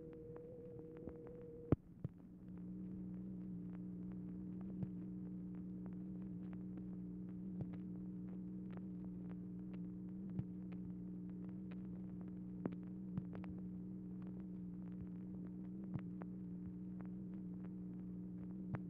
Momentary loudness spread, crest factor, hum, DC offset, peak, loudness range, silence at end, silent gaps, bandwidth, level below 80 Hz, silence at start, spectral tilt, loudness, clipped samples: 5 LU; 28 dB; 60 Hz at -65 dBFS; under 0.1%; -22 dBFS; 1 LU; 0 s; none; 3.3 kHz; -66 dBFS; 0 s; -10.5 dB/octave; -49 LUFS; under 0.1%